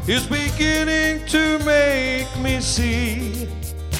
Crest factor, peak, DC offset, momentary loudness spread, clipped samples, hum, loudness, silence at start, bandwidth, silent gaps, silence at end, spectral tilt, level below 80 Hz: 16 dB; -4 dBFS; under 0.1%; 10 LU; under 0.1%; none; -19 LUFS; 0 s; 17 kHz; none; 0 s; -4 dB/octave; -30 dBFS